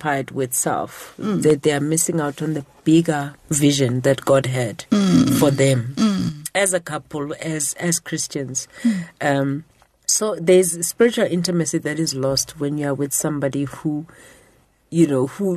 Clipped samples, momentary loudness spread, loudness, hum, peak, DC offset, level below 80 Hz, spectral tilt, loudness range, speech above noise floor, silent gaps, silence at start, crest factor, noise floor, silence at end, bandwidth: under 0.1%; 10 LU; -20 LUFS; none; -4 dBFS; under 0.1%; -54 dBFS; -4.5 dB/octave; 5 LU; 36 dB; none; 0 s; 16 dB; -56 dBFS; 0 s; 13.5 kHz